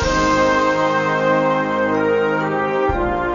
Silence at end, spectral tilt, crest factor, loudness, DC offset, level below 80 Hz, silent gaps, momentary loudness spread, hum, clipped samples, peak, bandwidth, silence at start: 0 s; -5.5 dB/octave; 12 dB; -17 LUFS; under 0.1%; -34 dBFS; none; 4 LU; none; under 0.1%; -6 dBFS; 7.4 kHz; 0 s